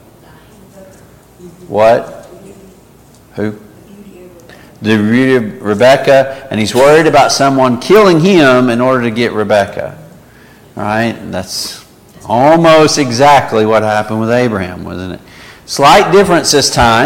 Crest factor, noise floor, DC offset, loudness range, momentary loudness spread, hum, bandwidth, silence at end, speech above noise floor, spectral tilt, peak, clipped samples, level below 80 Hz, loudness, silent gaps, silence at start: 10 dB; -41 dBFS; under 0.1%; 9 LU; 15 LU; none; 17 kHz; 0 s; 32 dB; -4.5 dB/octave; 0 dBFS; under 0.1%; -40 dBFS; -9 LUFS; none; 0.8 s